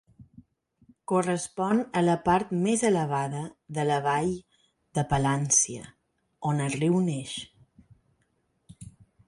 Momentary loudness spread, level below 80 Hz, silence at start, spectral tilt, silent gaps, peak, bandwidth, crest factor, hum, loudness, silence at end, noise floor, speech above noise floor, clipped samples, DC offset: 14 LU; -56 dBFS; 0.2 s; -5 dB/octave; none; -10 dBFS; 11.5 kHz; 18 dB; none; -27 LUFS; 0.4 s; -73 dBFS; 46 dB; under 0.1%; under 0.1%